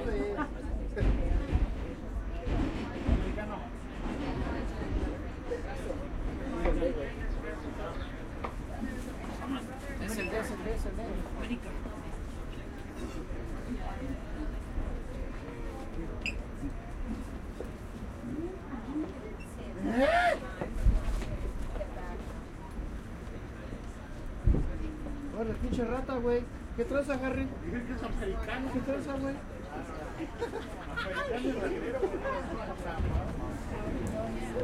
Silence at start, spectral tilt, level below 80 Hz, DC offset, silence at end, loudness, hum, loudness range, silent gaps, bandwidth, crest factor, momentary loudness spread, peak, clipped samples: 0 s; -6.5 dB/octave; -38 dBFS; under 0.1%; 0 s; -36 LUFS; none; 8 LU; none; 13.5 kHz; 20 dB; 10 LU; -14 dBFS; under 0.1%